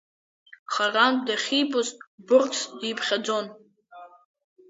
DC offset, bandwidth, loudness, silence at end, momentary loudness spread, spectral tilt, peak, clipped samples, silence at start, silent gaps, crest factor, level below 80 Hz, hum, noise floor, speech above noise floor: under 0.1%; 8 kHz; -24 LUFS; 0.65 s; 10 LU; -2 dB/octave; -6 dBFS; under 0.1%; 0.7 s; 2.07-2.18 s; 20 dB; -80 dBFS; none; -48 dBFS; 24 dB